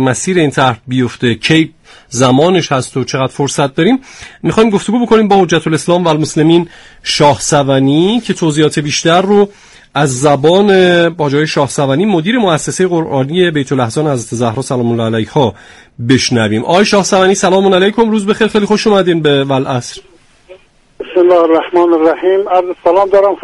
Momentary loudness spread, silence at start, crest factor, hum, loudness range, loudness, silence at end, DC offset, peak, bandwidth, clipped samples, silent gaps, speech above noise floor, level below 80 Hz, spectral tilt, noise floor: 7 LU; 0 s; 10 dB; none; 3 LU; -11 LUFS; 0.05 s; under 0.1%; 0 dBFS; 11.5 kHz; under 0.1%; none; 29 dB; -44 dBFS; -5 dB/octave; -40 dBFS